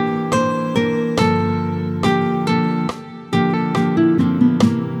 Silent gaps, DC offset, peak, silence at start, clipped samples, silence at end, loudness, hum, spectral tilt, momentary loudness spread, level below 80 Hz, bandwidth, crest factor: none; under 0.1%; -2 dBFS; 0 s; under 0.1%; 0 s; -18 LUFS; none; -7 dB/octave; 6 LU; -52 dBFS; 12 kHz; 16 dB